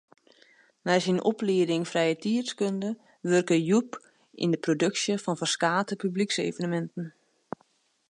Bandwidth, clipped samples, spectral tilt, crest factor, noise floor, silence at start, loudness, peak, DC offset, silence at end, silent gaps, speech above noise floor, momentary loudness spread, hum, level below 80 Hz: 11.5 kHz; under 0.1%; -5 dB/octave; 20 dB; -68 dBFS; 0.85 s; -27 LUFS; -8 dBFS; under 0.1%; 1 s; none; 41 dB; 16 LU; none; -78 dBFS